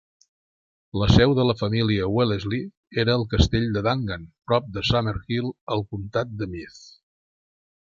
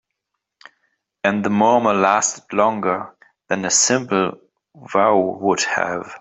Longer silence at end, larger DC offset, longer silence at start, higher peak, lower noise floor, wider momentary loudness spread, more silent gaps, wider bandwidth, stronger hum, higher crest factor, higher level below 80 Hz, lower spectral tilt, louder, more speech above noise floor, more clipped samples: first, 0.9 s vs 0.05 s; neither; second, 0.95 s vs 1.25 s; about the same, -2 dBFS vs 0 dBFS; first, under -90 dBFS vs -79 dBFS; first, 12 LU vs 9 LU; first, 2.77-2.83 s, 5.61-5.67 s vs none; second, 7.4 kHz vs 8.2 kHz; neither; about the same, 22 dB vs 18 dB; first, -36 dBFS vs -64 dBFS; first, -6.5 dB/octave vs -3 dB/octave; second, -23 LUFS vs -18 LUFS; first, over 67 dB vs 61 dB; neither